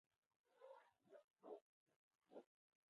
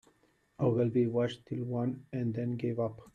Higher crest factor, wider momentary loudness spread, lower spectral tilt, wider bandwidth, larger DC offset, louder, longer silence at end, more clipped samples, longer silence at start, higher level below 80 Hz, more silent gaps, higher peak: first, 22 dB vs 16 dB; about the same, 5 LU vs 7 LU; second, -4 dB/octave vs -9 dB/octave; second, 4.6 kHz vs 8.6 kHz; neither; second, -66 LUFS vs -33 LUFS; first, 0.45 s vs 0.05 s; neither; second, 0.45 s vs 0.6 s; second, under -90 dBFS vs -68 dBFS; first, 1.24-1.28 s, 1.62-1.86 s, 1.96-2.19 s vs none; second, -46 dBFS vs -18 dBFS